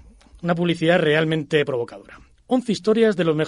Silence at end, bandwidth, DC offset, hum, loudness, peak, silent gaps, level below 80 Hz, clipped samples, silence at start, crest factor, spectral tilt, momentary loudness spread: 0 s; 11.5 kHz; under 0.1%; none; -20 LUFS; -4 dBFS; none; -54 dBFS; under 0.1%; 0.4 s; 18 dB; -6.5 dB/octave; 9 LU